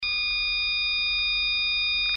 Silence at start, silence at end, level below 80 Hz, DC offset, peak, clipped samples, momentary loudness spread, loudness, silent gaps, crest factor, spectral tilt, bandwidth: 0 s; 0 s; -46 dBFS; under 0.1%; -16 dBFS; under 0.1%; 1 LU; -23 LUFS; none; 10 dB; 4 dB/octave; 5.8 kHz